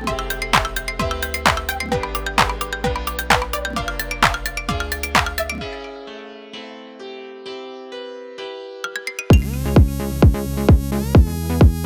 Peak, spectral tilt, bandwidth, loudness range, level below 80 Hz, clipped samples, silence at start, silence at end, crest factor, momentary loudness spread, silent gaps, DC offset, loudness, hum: -2 dBFS; -5.5 dB/octave; over 20 kHz; 14 LU; -26 dBFS; under 0.1%; 0 s; 0 s; 18 dB; 18 LU; none; under 0.1%; -19 LUFS; none